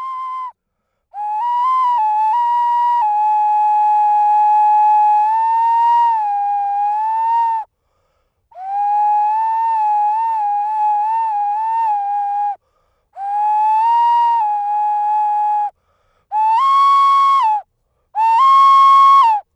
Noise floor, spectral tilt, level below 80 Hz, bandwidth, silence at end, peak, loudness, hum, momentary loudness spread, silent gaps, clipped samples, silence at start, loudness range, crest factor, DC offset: -72 dBFS; 1.5 dB/octave; -70 dBFS; 9.2 kHz; 0.15 s; -4 dBFS; -14 LUFS; none; 12 LU; none; under 0.1%; 0 s; 5 LU; 10 dB; under 0.1%